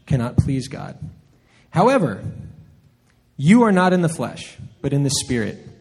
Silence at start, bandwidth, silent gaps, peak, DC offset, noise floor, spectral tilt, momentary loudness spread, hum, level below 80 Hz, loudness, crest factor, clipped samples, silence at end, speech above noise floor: 0.05 s; 13.5 kHz; none; 0 dBFS; under 0.1%; -58 dBFS; -6 dB/octave; 20 LU; none; -44 dBFS; -19 LUFS; 20 dB; under 0.1%; 0.1 s; 39 dB